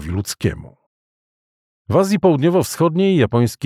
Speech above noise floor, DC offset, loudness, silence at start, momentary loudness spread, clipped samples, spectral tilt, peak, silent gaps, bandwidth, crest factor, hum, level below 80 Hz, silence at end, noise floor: over 74 dB; under 0.1%; -17 LUFS; 0 s; 9 LU; under 0.1%; -6.5 dB/octave; -2 dBFS; 0.86-1.85 s; 16 kHz; 16 dB; none; -44 dBFS; 0 s; under -90 dBFS